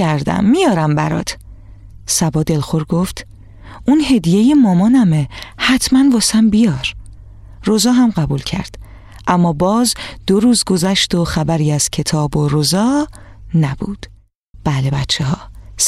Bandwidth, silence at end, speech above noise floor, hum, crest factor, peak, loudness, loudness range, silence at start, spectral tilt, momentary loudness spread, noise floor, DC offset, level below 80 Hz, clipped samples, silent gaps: 15 kHz; 0 s; 28 dB; none; 14 dB; -2 dBFS; -15 LUFS; 5 LU; 0 s; -5 dB/octave; 12 LU; -42 dBFS; under 0.1%; -36 dBFS; under 0.1%; 14.35-14.54 s